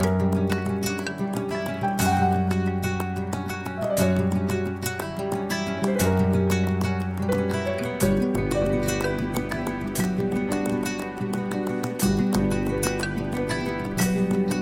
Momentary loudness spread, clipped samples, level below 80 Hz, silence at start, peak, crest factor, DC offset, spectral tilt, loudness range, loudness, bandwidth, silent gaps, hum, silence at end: 7 LU; under 0.1%; -42 dBFS; 0 s; -8 dBFS; 16 dB; under 0.1%; -6 dB/octave; 2 LU; -25 LUFS; 17 kHz; none; none; 0 s